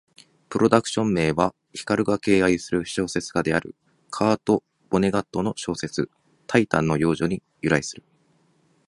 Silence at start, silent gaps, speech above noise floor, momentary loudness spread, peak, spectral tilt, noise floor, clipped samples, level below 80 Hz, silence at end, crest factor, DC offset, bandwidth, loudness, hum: 0.5 s; none; 41 dB; 10 LU; 0 dBFS; -5.5 dB/octave; -63 dBFS; under 0.1%; -52 dBFS; 0.95 s; 22 dB; under 0.1%; 11.5 kHz; -23 LUFS; none